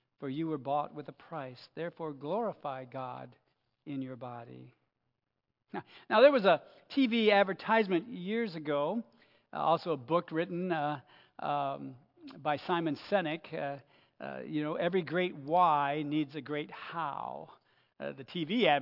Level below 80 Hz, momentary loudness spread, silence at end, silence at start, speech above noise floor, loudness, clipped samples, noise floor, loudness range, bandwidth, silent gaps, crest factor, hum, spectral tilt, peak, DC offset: -88 dBFS; 17 LU; 0 s; 0.2 s; 53 dB; -32 LUFS; under 0.1%; -85 dBFS; 12 LU; 5.8 kHz; none; 22 dB; none; -8 dB/octave; -10 dBFS; under 0.1%